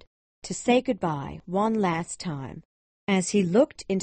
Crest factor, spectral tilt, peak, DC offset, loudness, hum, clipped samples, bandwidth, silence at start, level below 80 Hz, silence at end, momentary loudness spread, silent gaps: 18 dB; -5.5 dB/octave; -8 dBFS; under 0.1%; -26 LUFS; none; under 0.1%; 8.8 kHz; 0.45 s; -58 dBFS; 0 s; 14 LU; 2.65-3.07 s